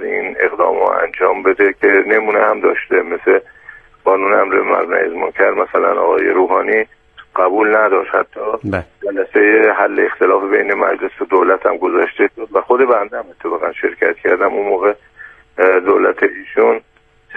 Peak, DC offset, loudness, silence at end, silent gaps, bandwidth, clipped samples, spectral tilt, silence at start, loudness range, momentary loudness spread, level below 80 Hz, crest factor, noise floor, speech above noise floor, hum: 0 dBFS; under 0.1%; -14 LUFS; 0 s; none; 3.7 kHz; under 0.1%; -8 dB/octave; 0 s; 2 LU; 8 LU; -54 dBFS; 14 dB; -40 dBFS; 26 dB; none